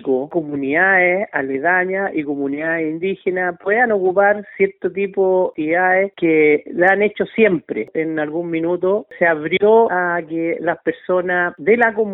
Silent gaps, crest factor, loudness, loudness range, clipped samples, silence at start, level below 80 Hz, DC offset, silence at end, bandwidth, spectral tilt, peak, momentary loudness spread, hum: none; 16 dB; -17 LUFS; 2 LU; under 0.1%; 0 s; -62 dBFS; under 0.1%; 0 s; 4 kHz; -9 dB/octave; 0 dBFS; 8 LU; none